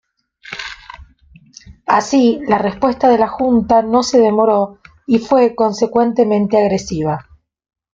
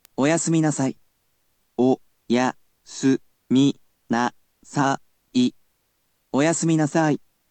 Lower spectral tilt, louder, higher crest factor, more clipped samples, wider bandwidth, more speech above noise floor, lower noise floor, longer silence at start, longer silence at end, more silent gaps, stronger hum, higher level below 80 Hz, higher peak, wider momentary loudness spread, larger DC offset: about the same, -5.5 dB/octave vs -5 dB/octave; first, -14 LUFS vs -23 LUFS; about the same, 14 dB vs 16 dB; neither; second, 7.8 kHz vs 9.2 kHz; second, 33 dB vs 49 dB; second, -47 dBFS vs -69 dBFS; first, 0.45 s vs 0.2 s; first, 0.75 s vs 0.35 s; neither; neither; first, -46 dBFS vs -70 dBFS; first, -2 dBFS vs -6 dBFS; first, 15 LU vs 8 LU; neither